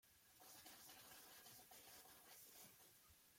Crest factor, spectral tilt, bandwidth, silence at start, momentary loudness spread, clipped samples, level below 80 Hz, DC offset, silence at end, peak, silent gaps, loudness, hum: 18 dB; -1 dB/octave; 16.5 kHz; 0.05 s; 6 LU; under 0.1%; -90 dBFS; under 0.1%; 0 s; -48 dBFS; none; -62 LUFS; none